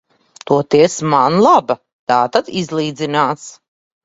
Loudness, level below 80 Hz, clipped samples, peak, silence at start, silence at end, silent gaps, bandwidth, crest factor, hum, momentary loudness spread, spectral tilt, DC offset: -15 LUFS; -58 dBFS; under 0.1%; 0 dBFS; 0.5 s; 0.55 s; 1.93-2.07 s; 8 kHz; 16 dB; none; 12 LU; -5 dB/octave; under 0.1%